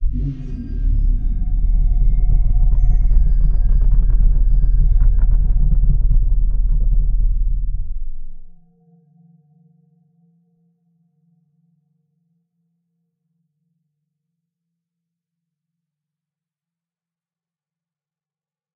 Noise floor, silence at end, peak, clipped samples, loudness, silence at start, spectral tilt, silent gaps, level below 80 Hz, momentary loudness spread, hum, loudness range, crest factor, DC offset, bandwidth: under -90 dBFS; 10.25 s; -2 dBFS; under 0.1%; -21 LUFS; 0 s; -11.5 dB/octave; none; -18 dBFS; 8 LU; none; 10 LU; 14 dB; under 0.1%; 0.9 kHz